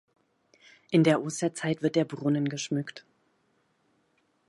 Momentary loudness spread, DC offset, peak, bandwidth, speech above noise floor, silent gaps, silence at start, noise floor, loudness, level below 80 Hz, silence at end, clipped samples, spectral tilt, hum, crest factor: 9 LU; under 0.1%; -10 dBFS; 11.5 kHz; 44 dB; none; 0.9 s; -71 dBFS; -28 LUFS; -76 dBFS; 1.5 s; under 0.1%; -5.5 dB/octave; none; 20 dB